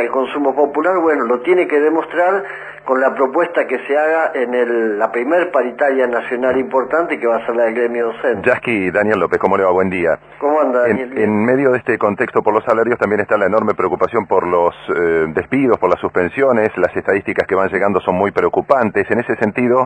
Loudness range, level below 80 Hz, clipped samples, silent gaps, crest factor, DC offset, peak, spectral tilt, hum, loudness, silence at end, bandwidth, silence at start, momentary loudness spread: 1 LU; -54 dBFS; under 0.1%; none; 16 dB; under 0.1%; 0 dBFS; -7.5 dB/octave; none; -16 LUFS; 0 s; 9.2 kHz; 0 s; 3 LU